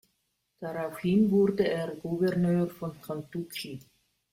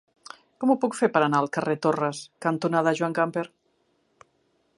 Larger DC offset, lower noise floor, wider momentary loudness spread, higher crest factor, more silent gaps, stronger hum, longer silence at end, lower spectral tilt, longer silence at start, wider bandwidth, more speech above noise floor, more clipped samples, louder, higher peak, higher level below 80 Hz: neither; first, -77 dBFS vs -69 dBFS; about the same, 15 LU vs 14 LU; second, 16 dB vs 22 dB; neither; neither; second, 0.55 s vs 1.3 s; first, -7.5 dB/octave vs -6 dB/octave; about the same, 0.6 s vs 0.6 s; first, 16.5 kHz vs 11.5 kHz; first, 49 dB vs 45 dB; neither; second, -29 LUFS vs -25 LUFS; second, -14 dBFS vs -6 dBFS; first, -64 dBFS vs -74 dBFS